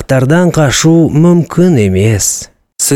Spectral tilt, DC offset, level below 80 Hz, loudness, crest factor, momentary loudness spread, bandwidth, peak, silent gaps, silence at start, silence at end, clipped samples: -5 dB/octave; 0.7%; -36 dBFS; -9 LUFS; 8 dB; 6 LU; 16.5 kHz; 0 dBFS; none; 0 s; 0 s; under 0.1%